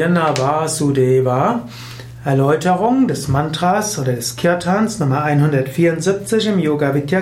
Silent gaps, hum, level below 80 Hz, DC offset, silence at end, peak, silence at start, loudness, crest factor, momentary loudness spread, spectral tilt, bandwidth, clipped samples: none; none; -46 dBFS; under 0.1%; 0 s; -4 dBFS; 0 s; -16 LUFS; 12 dB; 5 LU; -6 dB/octave; 16 kHz; under 0.1%